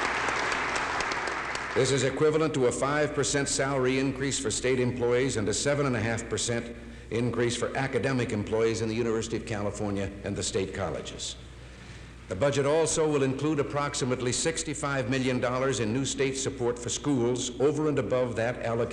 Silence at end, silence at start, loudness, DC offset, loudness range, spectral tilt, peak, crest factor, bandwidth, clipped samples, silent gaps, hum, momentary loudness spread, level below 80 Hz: 0 s; 0 s; -28 LUFS; under 0.1%; 4 LU; -4.5 dB/octave; -12 dBFS; 16 dB; 12 kHz; under 0.1%; none; none; 8 LU; -50 dBFS